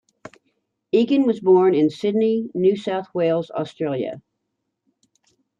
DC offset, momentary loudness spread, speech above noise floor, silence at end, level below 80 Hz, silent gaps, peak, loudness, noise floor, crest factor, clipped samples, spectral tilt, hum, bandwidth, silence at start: under 0.1%; 11 LU; 58 dB; 1.4 s; -70 dBFS; none; -6 dBFS; -20 LUFS; -77 dBFS; 16 dB; under 0.1%; -8 dB/octave; none; 7.6 kHz; 0.95 s